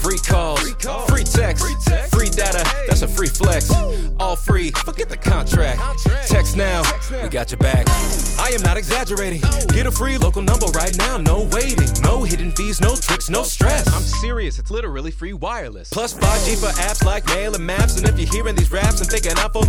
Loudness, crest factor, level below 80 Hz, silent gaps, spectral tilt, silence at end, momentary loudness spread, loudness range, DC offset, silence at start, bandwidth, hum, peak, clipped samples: -19 LUFS; 14 dB; -20 dBFS; none; -4 dB/octave; 0 s; 7 LU; 3 LU; under 0.1%; 0 s; 19.5 kHz; none; -2 dBFS; under 0.1%